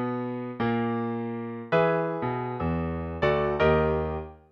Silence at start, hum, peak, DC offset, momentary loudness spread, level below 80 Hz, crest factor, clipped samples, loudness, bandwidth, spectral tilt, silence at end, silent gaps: 0 s; none; -10 dBFS; under 0.1%; 10 LU; -42 dBFS; 16 dB; under 0.1%; -27 LUFS; 6.4 kHz; -9 dB/octave; 0.15 s; none